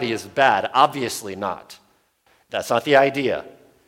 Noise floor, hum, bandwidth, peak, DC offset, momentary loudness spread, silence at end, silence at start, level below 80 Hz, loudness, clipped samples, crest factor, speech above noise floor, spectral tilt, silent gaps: -61 dBFS; none; 17 kHz; -2 dBFS; under 0.1%; 13 LU; 0.35 s; 0 s; -64 dBFS; -20 LUFS; under 0.1%; 20 dB; 41 dB; -4 dB/octave; none